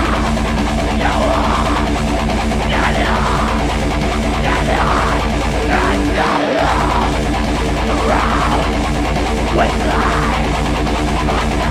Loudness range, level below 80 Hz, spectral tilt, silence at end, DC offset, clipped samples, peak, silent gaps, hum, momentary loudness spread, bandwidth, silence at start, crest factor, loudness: 1 LU; -20 dBFS; -5.5 dB/octave; 0 s; under 0.1%; under 0.1%; -2 dBFS; none; none; 3 LU; 14 kHz; 0 s; 12 dB; -16 LUFS